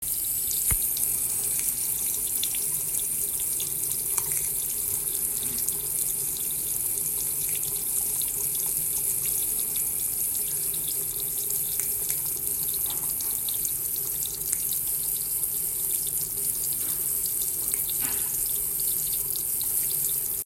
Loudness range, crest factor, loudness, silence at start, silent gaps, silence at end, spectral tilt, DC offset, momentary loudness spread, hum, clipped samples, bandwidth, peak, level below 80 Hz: 1 LU; 24 dB; -25 LUFS; 0 s; none; 0 s; -0.5 dB/octave; under 0.1%; 2 LU; none; under 0.1%; 16.5 kHz; -4 dBFS; -52 dBFS